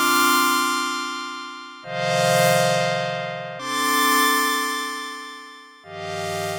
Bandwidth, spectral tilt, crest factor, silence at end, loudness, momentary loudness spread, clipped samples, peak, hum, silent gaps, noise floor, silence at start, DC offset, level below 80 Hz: over 20 kHz; -2.5 dB/octave; 16 dB; 0 s; -21 LUFS; 18 LU; under 0.1%; -6 dBFS; none; none; -42 dBFS; 0 s; under 0.1%; -74 dBFS